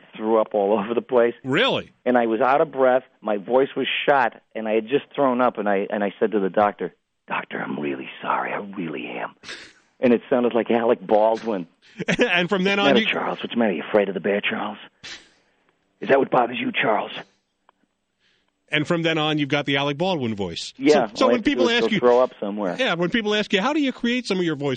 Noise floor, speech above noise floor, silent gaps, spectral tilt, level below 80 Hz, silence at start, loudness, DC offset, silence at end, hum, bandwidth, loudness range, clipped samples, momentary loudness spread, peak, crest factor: -71 dBFS; 49 dB; none; -5.5 dB/octave; -62 dBFS; 0.15 s; -21 LUFS; under 0.1%; 0 s; none; 9.4 kHz; 5 LU; under 0.1%; 12 LU; -2 dBFS; 18 dB